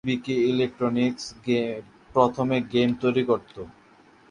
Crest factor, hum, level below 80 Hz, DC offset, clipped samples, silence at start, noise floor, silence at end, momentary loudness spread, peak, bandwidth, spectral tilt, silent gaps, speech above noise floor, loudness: 20 dB; none; -60 dBFS; under 0.1%; under 0.1%; 0.05 s; -55 dBFS; 0.6 s; 13 LU; -4 dBFS; 10 kHz; -6.5 dB/octave; none; 31 dB; -24 LUFS